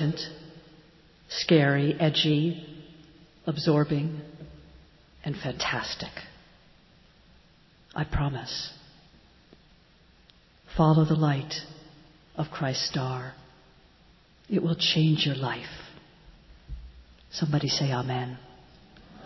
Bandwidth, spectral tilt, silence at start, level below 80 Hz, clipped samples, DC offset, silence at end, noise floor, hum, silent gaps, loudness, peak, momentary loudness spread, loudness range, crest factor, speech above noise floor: 6.2 kHz; -6 dB/octave; 0 s; -50 dBFS; under 0.1%; under 0.1%; 0 s; -59 dBFS; none; none; -27 LUFS; -8 dBFS; 23 LU; 10 LU; 22 dB; 32 dB